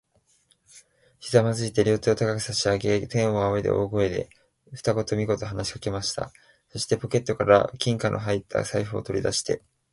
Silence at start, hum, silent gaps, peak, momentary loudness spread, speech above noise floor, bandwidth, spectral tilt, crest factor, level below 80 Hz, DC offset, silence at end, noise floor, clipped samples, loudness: 0.75 s; none; none; -4 dBFS; 10 LU; 40 dB; 11.5 kHz; -5 dB/octave; 22 dB; -50 dBFS; under 0.1%; 0.35 s; -65 dBFS; under 0.1%; -25 LUFS